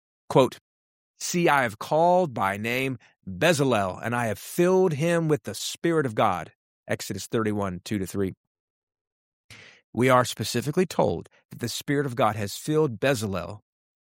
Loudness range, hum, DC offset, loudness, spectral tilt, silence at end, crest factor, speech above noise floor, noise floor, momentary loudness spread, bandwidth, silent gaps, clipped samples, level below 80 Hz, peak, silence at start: 5 LU; none; under 0.1%; -25 LUFS; -5 dB/octave; 0.5 s; 22 dB; over 65 dB; under -90 dBFS; 11 LU; 16.5 kHz; 0.61-1.14 s, 6.55-6.83 s, 8.37-8.87 s, 9.01-9.49 s, 9.84-9.93 s, 11.45-11.49 s; under 0.1%; -62 dBFS; -4 dBFS; 0.3 s